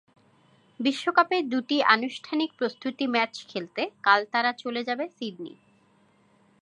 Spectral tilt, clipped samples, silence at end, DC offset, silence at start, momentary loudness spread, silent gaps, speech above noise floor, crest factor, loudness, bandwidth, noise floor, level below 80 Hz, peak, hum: -4 dB/octave; under 0.1%; 1.1 s; under 0.1%; 0.8 s; 12 LU; none; 36 dB; 24 dB; -26 LUFS; 11 kHz; -63 dBFS; -82 dBFS; -4 dBFS; none